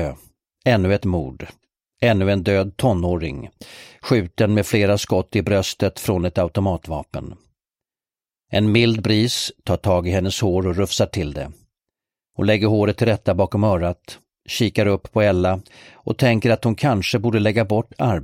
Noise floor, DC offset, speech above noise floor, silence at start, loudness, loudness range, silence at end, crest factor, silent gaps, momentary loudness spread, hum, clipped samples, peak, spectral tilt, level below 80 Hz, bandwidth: under -90 dBFS; under 0.1%; over 71 dB; 0 s; -20 LUFS; 3 LU; 0 s; 18 dB; none; 15 LU; none; under 0.1%; -2 dBFS; -6 dB/octave; -42 dBFS; 16 kHz